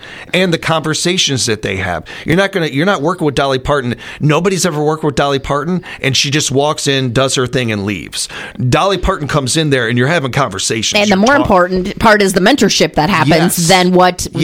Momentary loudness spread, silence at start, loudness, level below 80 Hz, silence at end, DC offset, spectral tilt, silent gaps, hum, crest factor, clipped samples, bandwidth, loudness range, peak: 8 LU; 0 s; -13 LUFS; -34 dBFS; 0 s; under 0.1%; -4 dB/octave; none; none; 12 dB; under 0.1%; 17 kHz; 4 LU; 0 dBFS